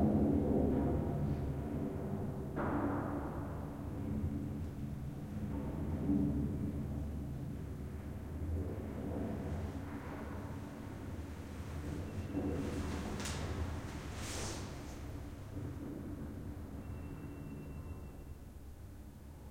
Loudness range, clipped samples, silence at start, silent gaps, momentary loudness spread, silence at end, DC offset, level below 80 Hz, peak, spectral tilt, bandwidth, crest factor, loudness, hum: 8 LU; under 0.1%; 0 s; none; 13 LU; 0 s; under 0.1%; -50 dBFS; -20 dBFS; -7 dB/octave; 16.5 kHz; 20 dB; -41 LUFS; none